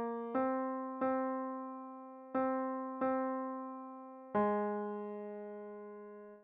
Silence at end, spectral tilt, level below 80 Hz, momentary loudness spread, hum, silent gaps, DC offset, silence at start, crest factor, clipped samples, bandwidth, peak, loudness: 0 s; -7 dB/octave; -78 dBFS; 14 LU; none; none; under 0.1%; 0 s; 16 dB; under 0.1%; 4 kHz; -22 dBFS; -38 LUFS